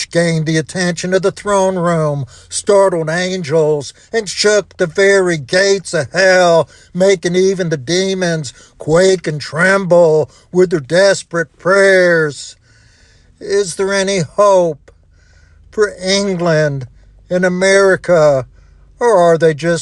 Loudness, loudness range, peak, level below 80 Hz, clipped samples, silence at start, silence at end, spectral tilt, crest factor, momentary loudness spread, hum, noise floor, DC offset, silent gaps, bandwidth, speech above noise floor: -13 LUFS; 4 LU; 0 dBFS; -48 dBFS; under 0.1%; 0 s; 0 s; -4.5 dB/octave; 12 dB; 10 LU; none; -47 dBFS; under 0.1%; none; 11.5 kHz; 35 dB